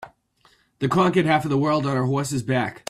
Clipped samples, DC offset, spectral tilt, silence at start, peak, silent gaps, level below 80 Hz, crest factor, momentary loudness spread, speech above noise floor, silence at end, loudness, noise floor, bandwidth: under 0.1%; under 0.1%; -6 dB/octave; 0 s; -6 dBFS; none; -58 dBFS; 18 dB; 6 LU; 39 dB; 0.1 s; -22 LUFS; -60 dBFS; 14 kHz